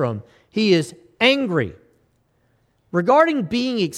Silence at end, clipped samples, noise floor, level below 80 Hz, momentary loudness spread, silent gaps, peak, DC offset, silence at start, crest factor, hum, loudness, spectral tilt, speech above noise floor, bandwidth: 0 s; under 0.1%; -63 dBFS; -58 dBFS; 14 LU; none; -2 dBFS; under 0.1%; 0 s; 18 dB; none; -19 LUFS; -5.5 dB/octave; 45 dB; 13 kHz